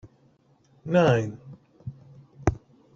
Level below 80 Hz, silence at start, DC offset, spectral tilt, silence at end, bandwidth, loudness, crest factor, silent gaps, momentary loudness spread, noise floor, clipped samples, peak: -48 dBFS; 0.05 s; under 0.1%; -7.5 dB/octave; 0.4 s; 7.8 kHz; -25 LUFS; 24 dB; none; 23 LU; -62 dBFS; under 0.1%; -4 dBFS